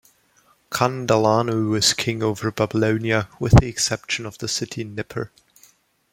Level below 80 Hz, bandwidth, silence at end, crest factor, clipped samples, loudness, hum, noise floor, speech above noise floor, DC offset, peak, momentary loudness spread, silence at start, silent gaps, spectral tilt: -36 dBFS; 16.5 kHz; 0.85 s; 22 dB; under 0.1%; -21 LUFS; none; -60 dBFS; 39 dB; under 0.1%; 0 dBFS; 14 LU; 0.7 s; none; -4.5 dB/octave